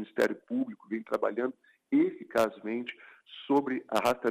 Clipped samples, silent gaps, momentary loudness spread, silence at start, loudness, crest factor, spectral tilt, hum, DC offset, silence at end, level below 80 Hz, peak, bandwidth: under 0.1%; none; 11 LU; 0 s; -31 LUFS; 18 dB; -5 dB/octave; none; under 0.1%; 0 s; -72 dBFS; -14 dBFS; 15.5 kHz